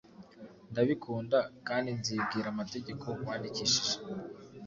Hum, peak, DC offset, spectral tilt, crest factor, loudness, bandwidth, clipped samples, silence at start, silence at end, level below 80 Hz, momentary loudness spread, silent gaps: none; -14 dBFS; under 0.1%; -3.5 dB/octave; 20 dB; -33 LUFS; 7.6 kHz; under 0.1%; 0.1 s; 0 s; -68 dBFS; 14 LU; none